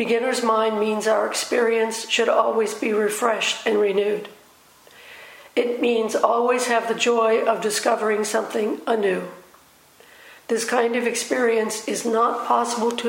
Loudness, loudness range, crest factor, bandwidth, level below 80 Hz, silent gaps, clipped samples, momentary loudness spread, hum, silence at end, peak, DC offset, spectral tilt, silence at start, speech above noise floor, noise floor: -21 LUFS; 4 LU; 20 dB; 16.5 kHz; -74 dBFS; none; under 0.1%; 6 LU; none; 0 s; -2 dBFS; under 0.1%; -2.5 dB/octave; 0 s; 32 dB; -53 dBFS